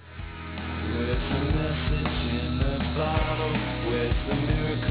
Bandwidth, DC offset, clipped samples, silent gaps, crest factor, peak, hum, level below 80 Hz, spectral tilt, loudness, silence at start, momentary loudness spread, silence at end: 4 kHz; under 0.1%; under 0.1%; none; 14 dB; -12 dBFS; none; -32 dBFS; -10.5 dB/octave; -27 LUFS; 0 s; 7 LU; 0 s